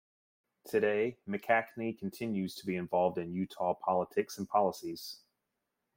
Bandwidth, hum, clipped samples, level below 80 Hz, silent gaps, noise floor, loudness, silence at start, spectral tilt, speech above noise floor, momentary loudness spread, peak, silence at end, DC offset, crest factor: 16.5 kHz; none; under 0.1%; -76 dBFS; none; -85 dBFS; -34 LUFS; 0.65 s; -6 dB/octave; 52 dB; 10 LU; -14 dBFS; 0.8 s; under 0.1%; 20 dB